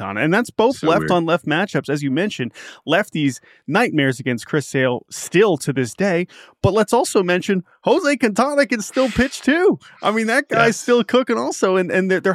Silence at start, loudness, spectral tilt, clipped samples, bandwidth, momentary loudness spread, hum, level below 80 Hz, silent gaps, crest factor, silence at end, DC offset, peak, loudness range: 0 s; -18 LUFS; -5 dB/octave; under 0.1%; 15.5 kHz; 6 LU; none; -48 dBFS; none; 18 dB; 0 s; under 0.1%; 0 dBFS; 3 LU